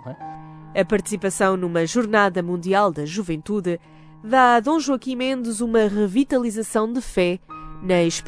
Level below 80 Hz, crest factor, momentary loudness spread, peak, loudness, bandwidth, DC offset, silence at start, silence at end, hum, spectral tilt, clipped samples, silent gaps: -48 dBFS; 18 dB; 13 LU; -4 dBFS; -21 LUFS; 11 kHz; under 0.1%; 0 s; 0 s; none; -5 dB/octave; under 0.1%; none